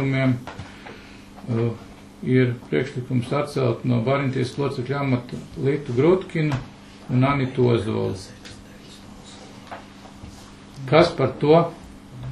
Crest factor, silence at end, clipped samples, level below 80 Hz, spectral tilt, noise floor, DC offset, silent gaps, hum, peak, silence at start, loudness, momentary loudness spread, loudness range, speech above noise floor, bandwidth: 22 dB; 0 s; under 0.1%; -50 dBFS; -7.5 dB/octave; -43 dBFS; under 0.1%; none; none; -2 dBFS; 0 s; -22 LUFS; 24 LU; 4 LU; 22 dB; 11.5 kHz